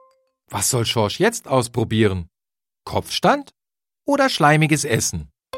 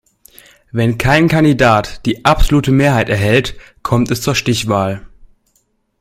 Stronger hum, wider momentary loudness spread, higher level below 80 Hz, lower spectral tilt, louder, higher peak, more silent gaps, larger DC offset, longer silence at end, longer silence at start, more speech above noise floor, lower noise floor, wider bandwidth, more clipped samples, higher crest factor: neither; about the same, 12 LU vs 10 LU; second, -48 dBFS vs -26 dBFS; second, -4 dB/octave vs -5.5 dB/octave; second, -19 LUFS vs -13 LUFS; about the same, 0 dBFS vs 0 dBFS; neither; neither; second, 0 s vs 0.95 s; second, 0.5 s vs 0.75 s; first, over 71 dB vs 49 dB; first, under -90 dBFS vs -61 dBFS; about the same, 16.5 kHz vs 16 kHz; neither; first, 20 dB vs 14 dB